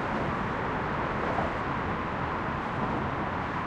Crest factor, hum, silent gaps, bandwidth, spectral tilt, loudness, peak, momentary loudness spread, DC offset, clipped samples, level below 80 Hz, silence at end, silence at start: 14 dB; none; none; 10.5 kHz; -7 dB/octave; -31 LUFS; -16 dBFS; 2 LU; under 0.1%; under 0.1%; -46 dBFS; 0 s; 0 s